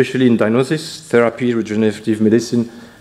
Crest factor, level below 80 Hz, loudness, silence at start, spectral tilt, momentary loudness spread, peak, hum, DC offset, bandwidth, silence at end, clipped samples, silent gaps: 16 dB; -60 dBFS; -16 LUFS; 0 s; -6 dB/octave; 6 LU; 0 dBFS; none; under 0.1%; 13 kHz; 0.15 s; under 0.1%; none